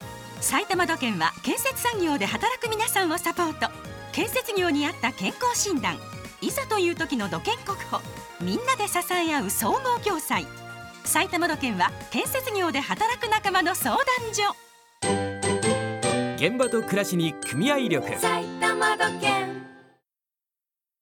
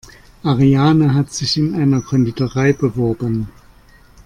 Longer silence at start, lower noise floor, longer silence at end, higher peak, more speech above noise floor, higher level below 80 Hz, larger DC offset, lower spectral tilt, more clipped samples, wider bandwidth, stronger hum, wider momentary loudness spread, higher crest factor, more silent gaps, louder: second, 0 s vs 0.45 s; first, under -90 dBFS vs -46 dBFS; first, 1.2 s vs 0.75 s; second, -6 dBFS vs -2 dBFS; first, over 65 dB vs 31 dB; second, -56 dBFS vs -42 dBFS; neither; second, -3 dB/octave vs -6.5 dB/octave; neither; first, 19 kHz vs 10.5 kHz; neither; about the same, 7 LU vs 9 LU; first, 20 dB vs 14 dB; neither; second, -25 LUFS vs -16 LUFS